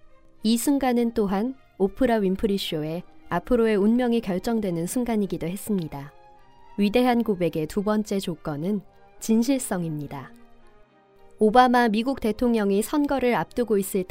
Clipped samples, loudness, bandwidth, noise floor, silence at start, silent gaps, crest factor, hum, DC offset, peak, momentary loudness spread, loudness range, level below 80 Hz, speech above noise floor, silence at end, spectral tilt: under 0.1%; -24 LUFS; 16 kHz; -54 dBFS; 0.05 s; none; 20 dB; none; under 0.1%; -4 dBFS; 11 LU; 4 LU; -48 dBFS; 31 dB; 0.05 s; -5.5 dB/octave